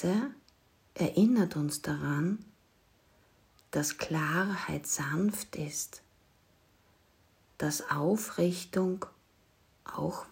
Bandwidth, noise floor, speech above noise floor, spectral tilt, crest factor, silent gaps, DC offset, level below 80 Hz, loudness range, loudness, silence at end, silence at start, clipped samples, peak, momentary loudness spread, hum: 16 kHz; -67 dBFS; 36 dB; -5 dB/octave; 18 dB; none; under 0.1%; -66 dBFS; 4 LU; -32 LUFS; 0.05 s; 0 s; under 0.1%; -14 dBFS; 12 LU; none